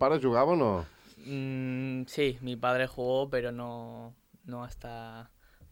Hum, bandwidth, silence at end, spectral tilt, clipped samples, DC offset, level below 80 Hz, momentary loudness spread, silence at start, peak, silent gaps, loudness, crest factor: none; 16.5 kHz; 0.05 s; -7 dB/octave; under 0.1%; under 0.1%; -56 dBFS; 21 LU; 0 s; -12 dBFS; none; -30 LUFS; 18 dB